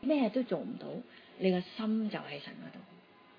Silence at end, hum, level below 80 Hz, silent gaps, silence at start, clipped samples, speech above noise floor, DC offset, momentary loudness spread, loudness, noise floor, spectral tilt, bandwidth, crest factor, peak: 0.4 s; none; -78 dBFS; none; 0 s; under 0.1%; 24 dB; under 0.1%; 18 LU; -35 LUFS; -59 dBFS; -5.5 dB/octave; 5.2 kHz; 18 dB; -18 dBFS